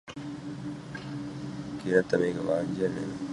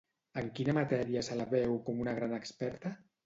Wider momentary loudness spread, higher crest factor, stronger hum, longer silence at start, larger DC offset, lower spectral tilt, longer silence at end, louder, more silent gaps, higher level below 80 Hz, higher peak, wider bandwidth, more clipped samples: first, 13 LU vs 9 LU; about the same, 22 dB vs 18 dB; neither; second, 0.05 s vs 0.35 s; neither; about the same, -6.5 dB/octave vs -6.5 dB/octave; second, 0 s vs 0.3 s; first, -31 LUFS vs -35 LUFS; neither; about the same, -60 dBFS vs -64 dBFS; first, -8 dBFS vs -18 dBFS; first, 11 kHz vs 8 kHz; neither